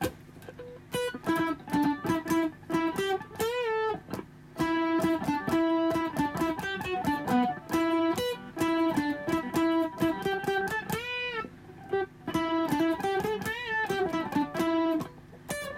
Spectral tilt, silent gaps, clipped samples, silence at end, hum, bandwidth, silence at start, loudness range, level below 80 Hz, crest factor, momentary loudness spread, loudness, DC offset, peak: -5 dB/octave; none; under 0.1%; 0 s; none; 16 kHz; 0 s; 2 LU; -58 dBFS; 14 dB; 10 LU; -30 LUFS; under 0.1%; -14 dBFS